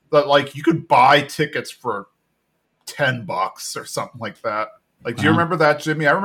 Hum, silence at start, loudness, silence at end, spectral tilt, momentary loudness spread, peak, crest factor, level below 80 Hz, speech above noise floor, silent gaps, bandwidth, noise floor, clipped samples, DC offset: none; 0.1 s; -19 LUFS; 0 s; -5 dB/octave; 16 LU; -4 dBFS; 16 dB; -64 dBFS; 51 dB; none; 17.5 kHz; -70 dBFS; under 0.1%; under 0.1%